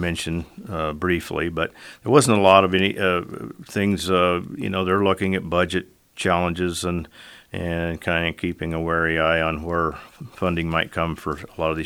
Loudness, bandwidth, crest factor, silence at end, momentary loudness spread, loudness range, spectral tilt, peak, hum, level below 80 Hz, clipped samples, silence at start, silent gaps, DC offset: -22 LUFS; 17 kHz; 22 dB; 0 s; 13 LU; 5 LU; -5 dB/octave; 0 dBFS; none; -44 dBFS; under 0.1%; 0 s; none; under 0.1%